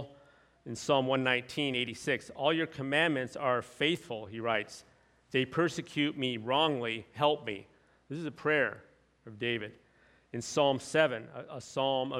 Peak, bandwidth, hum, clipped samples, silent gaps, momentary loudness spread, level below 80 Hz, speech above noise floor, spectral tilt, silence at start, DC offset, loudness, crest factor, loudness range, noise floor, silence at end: -12 dBFS; 14.5 kHz; none; under 0.1%; none; 15 LU; -72 dBFS; 33 dB; -4.5 dB/octave; 0 s; under 0.1%; -32 LUFS; 22 dB; 3 LU; -65 dBFS; 0 s